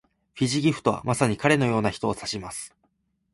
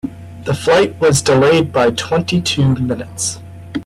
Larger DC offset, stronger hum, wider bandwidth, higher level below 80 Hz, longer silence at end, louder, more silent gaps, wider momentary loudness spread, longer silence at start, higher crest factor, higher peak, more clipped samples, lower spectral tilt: neither; neither; second, 12 kHz vs 15 kHz; second, -54 dBFS vs -44 dBFS; first, 0.65 s vs 0 s; second, -24 LUFS vs -14 LUFS; neither; about the same, 13 LU vs 14 LU; first, 0.35 s vs 0.05 s; first, 20 dB vs 12 dB; about the same, -6 dBFS vs -4 dBFS; neither; about the same, -5 dB/octave vs -5 dB/octave